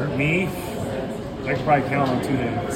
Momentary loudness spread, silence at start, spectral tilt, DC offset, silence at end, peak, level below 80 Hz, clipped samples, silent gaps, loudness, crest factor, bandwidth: 9 LU; 0 s; -6.5 dB/octave; under 0.1%; 0 s; -6 dBFS; -44 dBFS; under 0.1%; none; -23 LUFS; 18 dB; 17 kHz